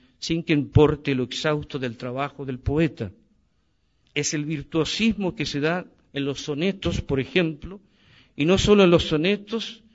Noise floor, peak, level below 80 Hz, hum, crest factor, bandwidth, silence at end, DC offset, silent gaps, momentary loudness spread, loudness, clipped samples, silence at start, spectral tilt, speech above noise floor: -68 dBFS; -4 dBFS; -42 dBFS; none; 20 dB; 8 kHz; 0.2 s; under 0.1%; none; 13 LU; -23 LUFS; under 0.1%; 0.2 s; -5.5 dB/octave; 45 dB